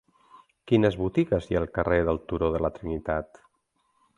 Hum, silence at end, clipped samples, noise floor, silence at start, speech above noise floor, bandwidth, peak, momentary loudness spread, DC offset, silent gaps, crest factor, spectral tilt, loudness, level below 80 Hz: none; 0.9 s; under 0.1%; -73 dBFS; 0.65 s; 47 dB; 10.5 kHz; -8 dBFS; 8 LU; under 0.1%; none; 20 dB; -8.5 dB/octave; -26 LUFS; -44 dBFS